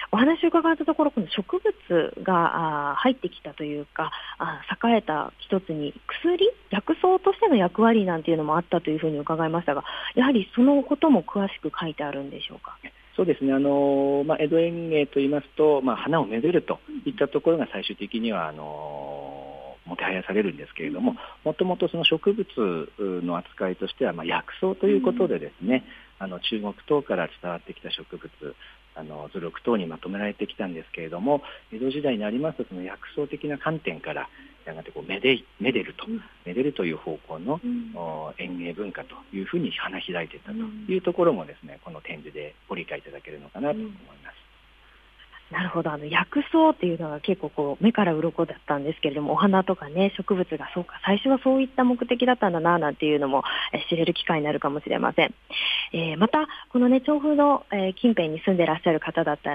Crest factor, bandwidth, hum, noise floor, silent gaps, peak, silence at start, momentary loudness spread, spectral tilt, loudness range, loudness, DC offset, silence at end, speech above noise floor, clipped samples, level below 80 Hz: 20 dB; 5 kHz; none; -55 dBFS; none; -6 dBFS; 0 s; 14 LU; -8.5 dB/octave; 8 LU; -25 LUFS; under 0.1%; 0 s; 30 dB; under 0.1%; -58 dBFS